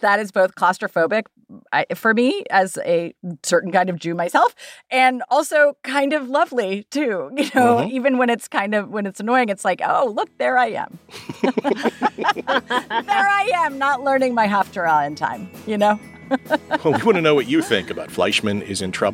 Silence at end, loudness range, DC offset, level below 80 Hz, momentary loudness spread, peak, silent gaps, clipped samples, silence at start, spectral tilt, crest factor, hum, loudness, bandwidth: 0 s; 2 LU; under 0.1%; -62 dBFS; 7 LU; -2 dBFS; none; under 0.1%; 0 s; -4.5 dB/octave; 18 dB; none; -19 LUFS; 16.5 kHz